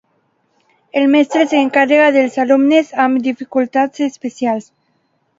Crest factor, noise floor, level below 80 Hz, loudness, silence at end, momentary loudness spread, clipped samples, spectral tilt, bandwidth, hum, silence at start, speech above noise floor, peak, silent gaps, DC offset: 14 dB; -63 dBFS; -66 dBFS; -14 LUFS; 0.75 s; 10 LU; under 0.1%; -4.5 dB/octave; 7.8 kHz; none; 0.95 s; 49 dB; 0 dBFS; none; under 0.1%